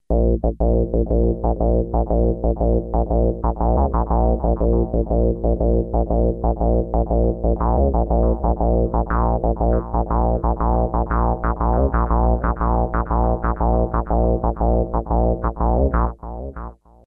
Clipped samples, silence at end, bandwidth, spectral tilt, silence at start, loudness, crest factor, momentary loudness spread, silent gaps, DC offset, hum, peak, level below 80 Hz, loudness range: under 0.1%; 0.35 s; 2.2 kHz; -14 dB/octave; 0.1 s; -20 LUFS; 12 dB; 2 LU; none; under 0.1%; none; -6 dBFS; -20 dBFS; 1 LU